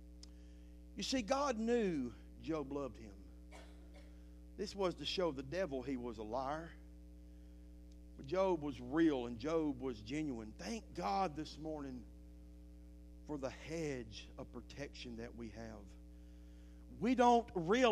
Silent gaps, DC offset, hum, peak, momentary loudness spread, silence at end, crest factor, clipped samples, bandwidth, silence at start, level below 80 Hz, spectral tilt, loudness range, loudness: none; under 0.1%; none; -18 dBFS; 23 LU; 0 s; 22 dB; under 0.1%; 13.5 kHz; 0 s; -56 dBFS; -5 dB/octave; 9 LU; -40 LUFS